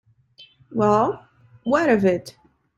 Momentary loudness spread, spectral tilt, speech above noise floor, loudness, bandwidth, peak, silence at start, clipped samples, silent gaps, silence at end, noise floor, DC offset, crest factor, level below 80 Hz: 13 LU; -7 dB/octave; 32 dB; -21 LUFS; 12.5 kHz; -6 dBFS; 0.4 s; under 0.1%; none; 0.45 s; -52 dBFS; under 0.1%; 18 dB; -58 dBFS